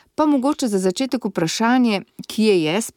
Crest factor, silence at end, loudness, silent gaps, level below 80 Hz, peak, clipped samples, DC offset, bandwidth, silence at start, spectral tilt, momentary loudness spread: 14 dB; 0.05 s; -19 LUFS; none; -64 dBFS; -6 dBFS; under 0.1%; under 0.1%; 17.5 kHz; 0.2 s; -4.5 dB/octave; 6 LU